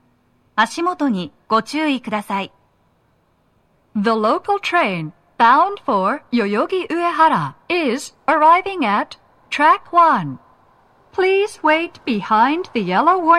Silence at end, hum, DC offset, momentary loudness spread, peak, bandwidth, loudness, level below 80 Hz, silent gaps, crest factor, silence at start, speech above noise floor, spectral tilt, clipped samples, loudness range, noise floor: 0 s; none; under 0.1%; 11 LU; -2 dBFS; 13.5 kHz; -17 LUFS; -62 dBFS; none; 16 dB; 0.55 s; 43 dB; -5 dB/octave; under 0.1%; 5 LU; -60 dBFS